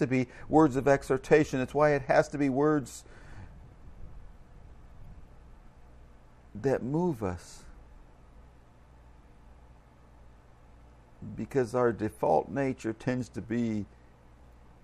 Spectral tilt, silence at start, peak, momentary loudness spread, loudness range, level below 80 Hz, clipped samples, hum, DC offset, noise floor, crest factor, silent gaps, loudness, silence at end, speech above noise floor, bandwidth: -7 dB/octave; 0 s; -8 dBFS; 24 LU; 14 LU; -52 dBFS; under 0.1%; none; under 0.1%; -55 dBFS; 22 dB; none; -28 LUFS; 1 s; 27 dB; 13.5 kHz